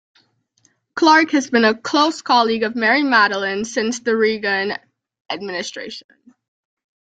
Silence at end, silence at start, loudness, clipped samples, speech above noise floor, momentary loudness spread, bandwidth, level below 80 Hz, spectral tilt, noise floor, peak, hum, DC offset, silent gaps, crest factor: 1.1 s; 0.95 s; -17 LUFS; under 0.1%; 44 dB; 16 LU; 9.2 kHz; -64 dBFS; -3 dB/octave; -62 dBFS; -2 dBFS; none; under 0.1%; 5.21-5.25 s; 18 dB